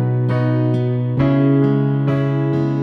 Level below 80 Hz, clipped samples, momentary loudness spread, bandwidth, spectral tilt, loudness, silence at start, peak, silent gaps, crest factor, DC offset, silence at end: -46 dBFS; under 0.1%; 4 LU; 5 kHz; -10.5 dB/octave; -17 LUFS; 0 s; -6 dBFS; none; 10 dB; under 0.1%; 0 s